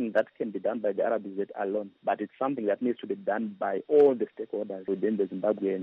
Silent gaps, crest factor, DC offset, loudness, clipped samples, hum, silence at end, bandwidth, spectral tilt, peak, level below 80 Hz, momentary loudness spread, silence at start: none; 16 dB; under 0.1%; -29 LUFS; under 0.1%; none; 0 s; 4 kHz; -6 dB/octave; -12 dBFS; -78 dBFS; 10 LU; 0 s